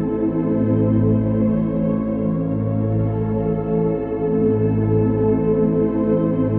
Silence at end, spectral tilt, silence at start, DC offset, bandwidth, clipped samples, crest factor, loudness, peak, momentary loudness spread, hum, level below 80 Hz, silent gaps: 0 s; -14 dB/octave; 0 s; under 0.1%; 3.3 kHz; under 0.1%; 12 dB; -19 LUFS; -6 dBFS; 4 LU; none; -38 dBFS; none